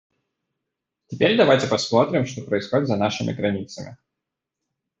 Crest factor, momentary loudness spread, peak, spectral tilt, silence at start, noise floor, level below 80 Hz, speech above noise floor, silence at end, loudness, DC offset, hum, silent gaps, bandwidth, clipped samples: 20 dB; 18 LU; -4 dBFS; -5.5 dB/octave; 1.1 s; -84 dBFS; -62 dBFS; 63 dB; 1.05 s; -21 LUFS; under 0.1%; none; none; 8.2 kHz; under 0.1%